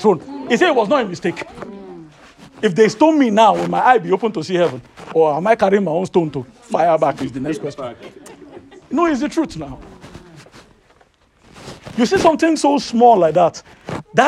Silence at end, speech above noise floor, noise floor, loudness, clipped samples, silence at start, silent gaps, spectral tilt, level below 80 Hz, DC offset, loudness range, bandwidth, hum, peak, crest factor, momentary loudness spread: 0 s; 39 dB; -54 dBFS; -16 LUFS; under 0.1%; 0 s; none; -5.5 dB/octave; -52 dBFS; under 0.1%; 9 LU; 12.5 kHz; none; 0 dBFS; 16 dB; 19 LU